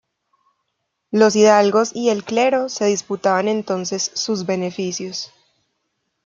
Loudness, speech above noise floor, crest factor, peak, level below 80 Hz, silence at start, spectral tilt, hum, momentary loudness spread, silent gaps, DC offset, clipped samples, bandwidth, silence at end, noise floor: -18 LUFS; 57 dB; 18 dB; -2 dBFS; -68 dBFS; 1.1 s; -4 dB/octave; none; 12 LU; none; under 0.1%; under 0.1%; 7.6 kHz; 1 s; -75 dBFS